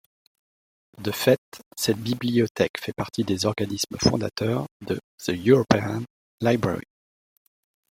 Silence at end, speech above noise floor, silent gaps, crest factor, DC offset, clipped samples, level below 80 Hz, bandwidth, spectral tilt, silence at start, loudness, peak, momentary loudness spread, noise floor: 1.1 s; over 66 dB; 1.38-1.52 s, 1.66-1.71 s, 2.51-2.55 s, 2.70-2.74 s, 4.71-4.80 s, 5.04-5.18 s, 6.10-6.38 s; 22 dB; under 0.1%; under 0.1%; -54 dBFS; 16.5 kHz; -5 dB/octave; 1 s; -25 LUFS; -2 dBFS; 12 LU; under -90 dBFS